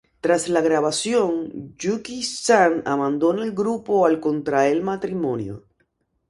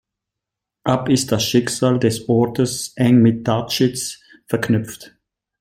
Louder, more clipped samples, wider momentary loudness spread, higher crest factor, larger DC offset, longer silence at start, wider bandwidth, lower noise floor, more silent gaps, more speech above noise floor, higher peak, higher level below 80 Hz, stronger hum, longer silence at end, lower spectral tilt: second, -21 LUFS vs -18 LUFS; neither; about the same, 10 LU vs 12 LU; about the same, 18 dB vs 16 dB; neither; second, 0.25 s vs 0.85 s; second, 11.5 kHz vs 16 kHz; second, -69 dBFS vs -84 dBFS; neither; second, 48 dB vs 66 dB; about the same, -4 dBFS vs -2 dBFS; second, -60 dBFS vs -54 dBFS; neither; first, 0.7 s vs 0.5 s; about the same, -4.5 dB/octave vs -5.5 dB/octave